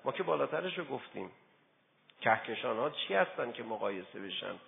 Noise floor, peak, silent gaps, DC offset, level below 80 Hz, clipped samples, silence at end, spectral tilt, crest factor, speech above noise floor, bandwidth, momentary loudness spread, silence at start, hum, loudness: -70 dBFS; -14 dBFS; none; under 0.1%; -84 dBFS; under 0.1%; 0 s; 0 dB/octave; 22 dB; 35 dB; 3.9 kHz; 11 LU; 0.05 s; none; -35 LUFS